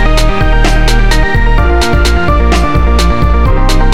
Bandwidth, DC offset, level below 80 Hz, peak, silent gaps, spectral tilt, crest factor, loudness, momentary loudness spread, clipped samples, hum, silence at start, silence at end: 13.5 kHz; 20%; -8 dBFS; 0 dBFS; none; -5.5 dB/octave; 8 dB; -10 LUFS; 1 LU; under 0.1%; none; 0 s; 0 s